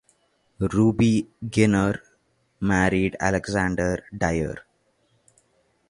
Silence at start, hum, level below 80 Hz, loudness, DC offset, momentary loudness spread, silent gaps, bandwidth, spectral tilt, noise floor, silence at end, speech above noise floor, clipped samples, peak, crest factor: 0.6 s; none; -44 dBFS; -23 LUFS; under 0.1%; 10 LU; none; 11.5 kHz; -6.5 dB/octave; -66 dBFS; 1.3 s; 44 dB; under 0.1%; -4 dBFS; 20 dB